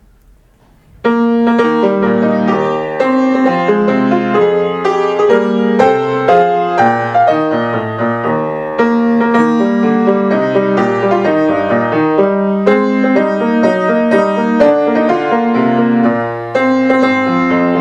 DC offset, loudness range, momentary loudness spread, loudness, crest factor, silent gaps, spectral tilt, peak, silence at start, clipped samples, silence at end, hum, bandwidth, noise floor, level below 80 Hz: under 0.1%; 1 LU; 4 LU; -12 LUFS; 12 dB; none; -7.5 dB/octave; 0 dBFS; 1.05 s; under 0.1%; 0 s; none; 8 kHz; -47 dBFS; -52 dBFS